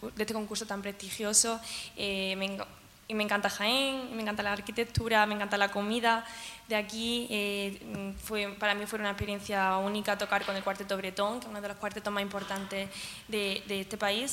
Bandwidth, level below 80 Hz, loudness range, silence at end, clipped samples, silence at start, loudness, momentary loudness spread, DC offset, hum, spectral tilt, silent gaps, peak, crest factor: 16 kHz; -58 dBFS; 4 LU; 0 s; under 0.1%; 0 s; -31 LUFS; 11 LU; under 0.1%; none; -2.5 dB/octave; none; -10 dBFS; 22 dB